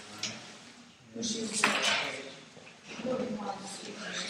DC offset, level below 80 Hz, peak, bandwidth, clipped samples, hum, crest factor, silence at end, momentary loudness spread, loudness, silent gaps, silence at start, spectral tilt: under 0.1%; -74 dBFS; -8 dBFS; 16 kHz; under 0.1%; none; 28 dB; 0 s; 22 LU; -32 LUFS; none; 0 s; -2 dB/octave